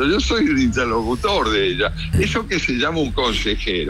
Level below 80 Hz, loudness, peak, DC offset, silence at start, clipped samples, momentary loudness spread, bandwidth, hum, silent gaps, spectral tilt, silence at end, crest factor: -30 dBFS; -19 LUFS; -8 dBFS; under 0.1%; 0 s; under 0.1%; 3 LU; 15 kHz; none; none; -5 dB/octave; 0 s; 10 dB